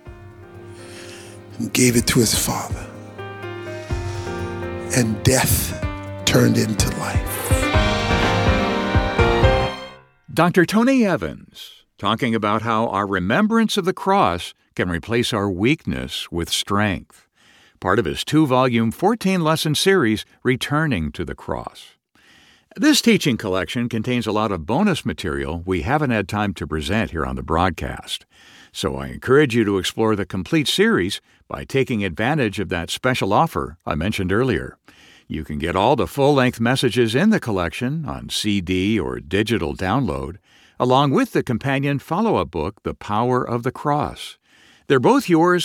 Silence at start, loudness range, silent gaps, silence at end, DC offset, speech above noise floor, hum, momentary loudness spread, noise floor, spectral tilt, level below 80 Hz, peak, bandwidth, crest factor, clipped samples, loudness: 0.05 s; 4 LU; none; 0 s; under 0.1%; 34 dB; none; 14 LU; -54 dBFS; -5 dB/octave; -36 dBFS; -2 dBFS; 18.5 kHz; 18 dB; under 0.1%; -20 LUFS